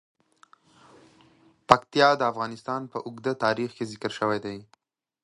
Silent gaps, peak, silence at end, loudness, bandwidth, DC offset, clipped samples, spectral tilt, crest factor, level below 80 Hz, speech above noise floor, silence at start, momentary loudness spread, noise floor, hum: none; 0 dBFS; 0.6 s; -25 LUFS; 11.5 kHz; under 0.1%; under 0.1%; -5 dB/octave; 28 dB; -62 dBFS; 33 dB; 1.7 s; 12 LU; -60 dBFS; none